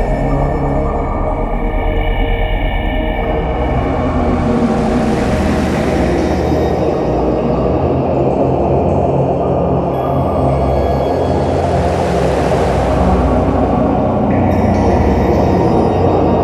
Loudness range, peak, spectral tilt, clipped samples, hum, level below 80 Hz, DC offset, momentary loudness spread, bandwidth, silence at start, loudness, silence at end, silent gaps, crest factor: 4 LU; 0 dBFS; -8 dB/octave; under 0.1%; none; -20 dBFS; under 0.1%; 5 LU; 13.5 kHz; 0 s; -14 LUFS; 0 s; none; 12 dB